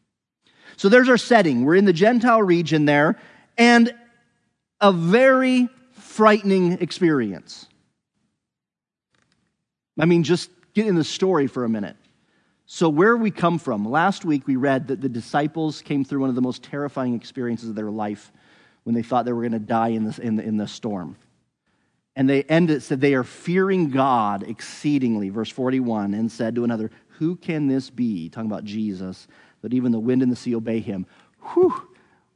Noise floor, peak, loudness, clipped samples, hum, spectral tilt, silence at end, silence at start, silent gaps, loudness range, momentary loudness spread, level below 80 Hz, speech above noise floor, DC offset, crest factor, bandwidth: -89 dBFS; 0 dBFS; -21 LUFS; under 0.1%; none; -6.5 dB/octave; 0.55 s; 0.8 s; none; 8 LU; 13 LU; -72 dBFS; 69 dB; under 0.1%; 20 dB; 10.5 kHz